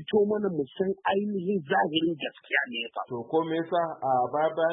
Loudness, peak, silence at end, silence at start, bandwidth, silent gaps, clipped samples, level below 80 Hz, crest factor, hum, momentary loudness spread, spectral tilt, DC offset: -28 LUFS; -12 dBFS; 0 s; 0 s; 3.9 kHz; none; under 0.1%; -72 dBFS; 16 dB; none; 6 LU; -9.5 dB/octave; under 0.1%